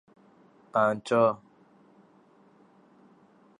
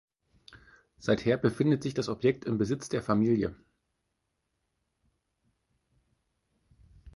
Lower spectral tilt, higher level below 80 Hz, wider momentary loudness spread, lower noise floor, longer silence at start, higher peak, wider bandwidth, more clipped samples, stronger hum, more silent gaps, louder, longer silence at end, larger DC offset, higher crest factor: about the same, -6.5 dB/octave vs -7 dB/octave; second, -78 dBFS vs -60 dBFS; about the same, 8 LU vs 6 LU; second, -60 dBFS vs -81 dBFS; second, 0.75 s vs 1 s; about the same, -12 dBFS vs -10 dBFS; about the same, 11 kHz vs 11.5 kHz; neither; neither; neither; first, -26 LUFS vs -29 LUFS; first, 2.25 s vs 0.05 s; neither; about the same, 20 dB vs 22 dB